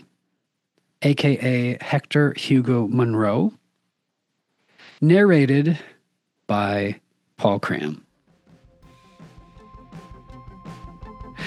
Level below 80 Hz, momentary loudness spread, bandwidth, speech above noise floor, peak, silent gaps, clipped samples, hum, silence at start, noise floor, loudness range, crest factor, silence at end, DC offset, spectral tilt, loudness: -54 dBFS; 24 LU; 12 kHz; 57 dB; -4 dBFS; none; under 0.1%; none; 1 s; -76 dBFS; 9 LU; 20 dB; 0 s; under 0.1%; -7.5 dB/octave; -20 LUFS